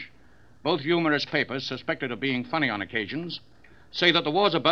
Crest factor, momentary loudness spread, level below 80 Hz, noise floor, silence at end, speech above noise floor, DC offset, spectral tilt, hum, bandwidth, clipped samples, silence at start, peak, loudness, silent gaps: 20 dB; 13 LU; -64 dBFS; -57 dBFS; 0 s; 31 dB; 0.2%; -5.5 dB/octave; none; 7.4 kHz; under 0.1%; 0 s; -6 dBFS; -26 LUFS; none